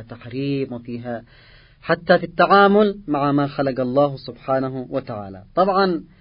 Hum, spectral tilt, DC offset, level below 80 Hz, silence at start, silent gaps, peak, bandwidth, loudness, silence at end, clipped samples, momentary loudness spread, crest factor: none; -11.5 dB/octave; under 0.1%; -52 dBFS; 0 s; none; -2 dBFS; 5.4 kHz; -19 LUFS; 0.15 s; under 0.1%; 17 LU; 18 dB